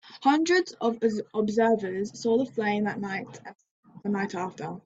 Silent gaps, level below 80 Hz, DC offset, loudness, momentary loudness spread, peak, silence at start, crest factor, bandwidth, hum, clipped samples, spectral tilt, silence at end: 3.71-3.83 s; -70 dBFS; under 0.1%; -27 LUFS; 11 LU; -10 dBFS; 0.05 s; 18 dB; 8 kHz; none; under 0.1%; -5.5 dB/octave; 0.05 s